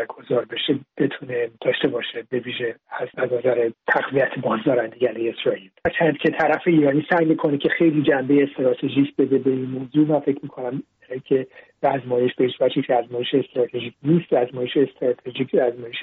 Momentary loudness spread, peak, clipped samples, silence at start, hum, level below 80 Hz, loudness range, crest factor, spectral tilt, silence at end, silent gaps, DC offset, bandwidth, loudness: 9 LU; -6 dBFS; under 0.1%; 0 s; none; -62 dBFS; 4 LU; 14 dB; -4.5 dB/octave; 0 s; none; under 0.1%; 4.6 kHz; -21 LUFS